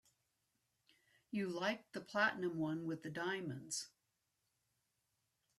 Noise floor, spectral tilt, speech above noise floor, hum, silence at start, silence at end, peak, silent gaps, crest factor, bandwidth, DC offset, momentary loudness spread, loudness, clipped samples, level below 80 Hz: -86 dBFS; -4 dB/octave; 45 dB; none; 1.3 s; 1.7 s; -22 dBFS; none; 22 dB; 14 kHz; under 0.1%; 8 LU; -41 LUFS; under 0.1%; -86 dBFS